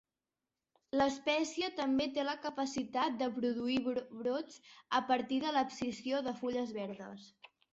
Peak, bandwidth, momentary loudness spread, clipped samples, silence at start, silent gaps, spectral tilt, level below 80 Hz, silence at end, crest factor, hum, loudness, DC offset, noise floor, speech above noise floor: -18 dBFS; 8 kHz; 9 LU; under 0.1%; 0.95 s; none; -2 dB/octave; -72 dBFS; 0.45 s; 18 dB; none; -36 LUFS; under 0.1%; under -90 dBFS; over 54 dB